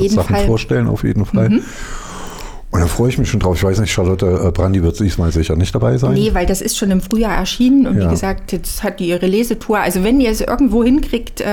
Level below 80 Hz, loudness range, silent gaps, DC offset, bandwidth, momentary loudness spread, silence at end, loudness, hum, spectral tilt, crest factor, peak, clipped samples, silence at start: -24 dBFS; 2 LU; none; under 0.1%; 19 kHz; 8 LU; 0 s; -15 LUFS; none; -6 dB/octave; 10 dB; -4 dBFS; under 0.1%; 0 s